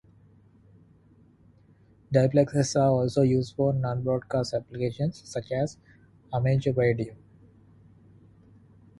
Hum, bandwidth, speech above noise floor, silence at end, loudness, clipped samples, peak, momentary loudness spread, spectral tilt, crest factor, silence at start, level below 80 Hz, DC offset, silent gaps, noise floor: none; 11.5 kHz; 33 dB; 1.85 s; -26 LUFS; under 0.1%; -8 dBFS; 9 LU; -7 dB/octave; 20 dB; 2.1 s; -56 dBFS; under 0.1%; none; -58 dBFS